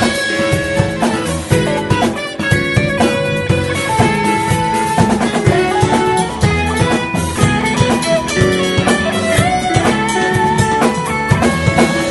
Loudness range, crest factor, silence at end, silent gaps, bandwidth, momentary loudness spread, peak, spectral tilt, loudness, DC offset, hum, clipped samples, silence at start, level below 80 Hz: 1 LU; 14 dB; 0 s; none; 12 kHz; 3 LU; 0 dBFS; -5 dB/octave; -14 LUFS; under 0.1%; none; under 0.1%; 0 s; -32 dBFS